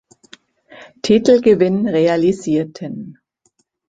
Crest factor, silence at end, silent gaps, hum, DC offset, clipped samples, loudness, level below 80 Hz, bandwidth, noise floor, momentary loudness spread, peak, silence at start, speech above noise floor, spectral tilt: 16 dB; 0.75 s; none; none; under 0.1%; under 0.1%; -15 LUFS; -54 dBFS; 9.2 kHz; -64 dBFS; 17 LU; 0 dBFS; 0.8 s; 49 dB; -6.5 dB/octave